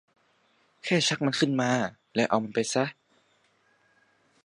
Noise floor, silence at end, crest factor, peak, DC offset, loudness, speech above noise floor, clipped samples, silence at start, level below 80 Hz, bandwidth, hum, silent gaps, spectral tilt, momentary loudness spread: -67 dBFS; 1.55 s; 22 dB; -8 dBFS; under 0.1%; -27 LUFS; 41 dB; under 0.1%; 0.85 s; -72 dBFS; 11.5 kHz; none; none; -4 dB/octave; 6 LU